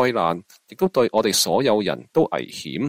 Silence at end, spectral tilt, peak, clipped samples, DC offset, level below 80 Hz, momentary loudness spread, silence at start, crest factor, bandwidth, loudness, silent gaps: 0 s; -4 dB/octave; -4 dBFS; under 0.1%; under 0.1%; -60 dBFS; 9 LU; 0 s; 16 dB; 16 kHz; -21 LUFS; none